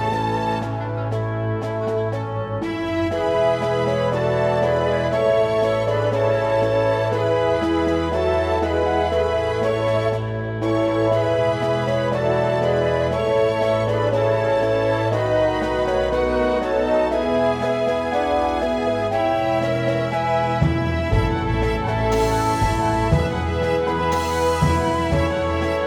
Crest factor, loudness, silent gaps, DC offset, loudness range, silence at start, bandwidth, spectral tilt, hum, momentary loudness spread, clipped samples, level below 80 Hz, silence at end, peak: 16 dB; -20 LUFS; none; under 0.1%; 1 LU; 0 s; 17.5 kHz; -6.5 dB/octave; none; 4 LU; under 0.1%; -34 dBFS; 0 s; -4 dBFS